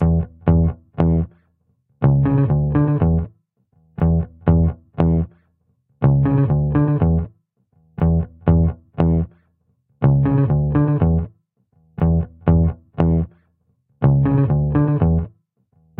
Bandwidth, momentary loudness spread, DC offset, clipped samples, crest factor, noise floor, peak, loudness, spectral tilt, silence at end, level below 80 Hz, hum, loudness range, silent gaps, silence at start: 3.3 kHz; 6 LU; under 0.1%; under 0.1%; 18 dB; -64 dBFS; 0 dBFS; -18 LUFS; -13.5 dB/octave; 0.7 s; -30 dBFS; none; 2 LU; none; 0 s